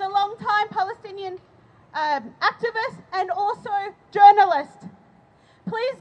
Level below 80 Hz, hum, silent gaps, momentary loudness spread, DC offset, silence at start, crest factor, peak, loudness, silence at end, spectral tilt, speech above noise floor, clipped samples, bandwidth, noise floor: -70 dBFS; none; none; 20 LU; under 0.1%; 0 s; 20 dB; -2 dBFS; -21 LUFS; 0.05 s; -4.5 dB/octave; 35 dB; under 0.1%; 8 kHz; -55 dBFS